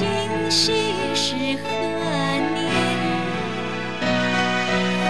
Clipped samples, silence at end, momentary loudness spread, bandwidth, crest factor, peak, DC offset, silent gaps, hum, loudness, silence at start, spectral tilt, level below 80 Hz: under 0.1%; 0 s; 6 LU; 11 kHz; 14 dB; -8 dBFS; 1%; none; none; -21 LUFS; 0 s; -4 dB/octave; -50 dBFS